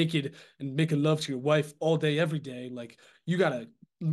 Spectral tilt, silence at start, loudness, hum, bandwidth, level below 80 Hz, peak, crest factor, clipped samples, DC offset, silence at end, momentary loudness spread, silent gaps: -6.5 dB/octave; 0 s; -29 LUFS; none; 12.5 kHz; -76 dBFS; -12 dBFS; 18 dB; under 0.1%; under 0.1%; 0 s; 15 LU; none